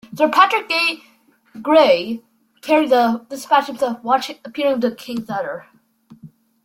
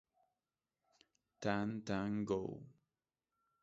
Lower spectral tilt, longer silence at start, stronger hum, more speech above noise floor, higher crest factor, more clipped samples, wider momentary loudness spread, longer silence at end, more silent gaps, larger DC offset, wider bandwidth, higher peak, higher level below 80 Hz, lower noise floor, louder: second, -4 dB/octave vs -6 dB/octave; second, 0.1 s vs 1.4 s; neither; second, 32 dB vs over 50 dB; second, 18 dB vs 24 dB; neither; first, 15 LU vs 8 LU; second, 0.35 s vs 0.9 s; neither; neither; first, 16.5 kHz vs 7.6 kHz; first, -2 dBFS vs -20 dBFS; first, -64 dBFS vs -70 dBFS; second, -49 dBFS vs under -90 dBFS; first, -18 LUFS vs -41 LUFS